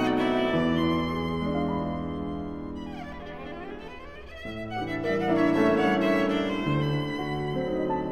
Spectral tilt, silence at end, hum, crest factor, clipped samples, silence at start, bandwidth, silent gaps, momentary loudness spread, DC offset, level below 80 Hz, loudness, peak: -7 dB/octave; 0 s; none; 16 dB; under 0.1%; 0 s; 14 kHz; none; 16 LU; 0.4%; -48 dBFS; -27 LUFS; -10 dBFS